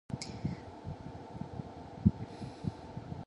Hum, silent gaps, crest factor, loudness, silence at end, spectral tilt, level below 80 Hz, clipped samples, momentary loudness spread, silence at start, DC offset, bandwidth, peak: none; none; 26 dB; -39 LUFS; 0 s; -7 dB/octave; -50 dBFS; under 0.1%; 14 LU; 0.1 s; under 0.1%; 11 kHz; -12 dBFS